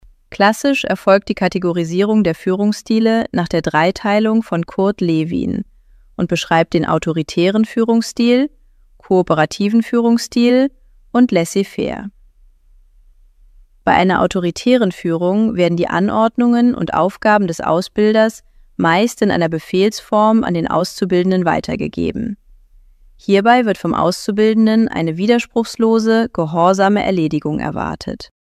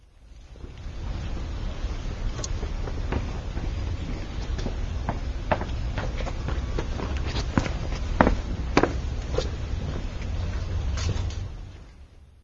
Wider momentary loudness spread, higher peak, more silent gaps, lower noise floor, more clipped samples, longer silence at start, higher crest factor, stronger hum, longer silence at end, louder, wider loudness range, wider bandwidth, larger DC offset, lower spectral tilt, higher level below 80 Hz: second, 8 LU vs 12 LU; about the same, 0 dBFS vs 0 dBFS; neither; about the same, -48 dBFS vs -49 dBFS; neither; first, 0.3 s vs 0 s; second, 16 dB vs 28 dB; neither; first, 0.25 s vs 0.05 s; first, -15 LUFS vs -30 LUFS; second, 3 LU vs 6 LU; first, 14 kHz vs 7.8 kHz; neither; about the same, -6 dB/octave vs -6 dB/octave; second, -46 dBFS vs -30 dBFS